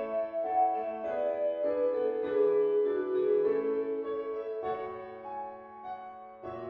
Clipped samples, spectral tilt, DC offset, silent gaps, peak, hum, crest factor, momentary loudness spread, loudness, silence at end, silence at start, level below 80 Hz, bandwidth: under 0.1%; -8.5 dB/octave; under 0.1%; none; -18 dBFS; none; 14 dB; 15 LU; -31 LUFS; 0 s; 0 s; -72 dBFS; 4.3 kHz